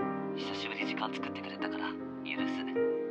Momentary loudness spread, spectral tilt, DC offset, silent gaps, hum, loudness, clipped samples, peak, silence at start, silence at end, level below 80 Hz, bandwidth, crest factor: 6 LU; -5.5 dB/octave; under 0.1%; none; none; -36 LUFS; under 0.1%; -20 dBFS; 0 s; 0 s; -78 dBFS; 8.4 kHz; 16 dB